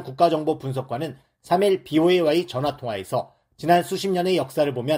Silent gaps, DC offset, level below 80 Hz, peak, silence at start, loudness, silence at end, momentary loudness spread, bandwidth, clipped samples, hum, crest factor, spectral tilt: none; under 0.1%; -62 dBFS; -4 dBFS; 0 s; -22 LUFS; 0 s; 11 LU; 16 kHz; under 0.1%; none; 18 dB; -6 dB/octave